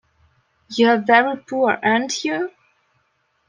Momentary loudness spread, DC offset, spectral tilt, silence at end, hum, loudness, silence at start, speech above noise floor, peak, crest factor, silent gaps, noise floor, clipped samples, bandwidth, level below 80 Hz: 11 LU; under 0.1%; -3.5 dB/octave; 1 s; none; -18 LUFS; 0.7 s; 49 dB; -2 dBFS; 18 dB; none; -67 dBFS; under 0.1%; 9.8 kHz; -70 dBFS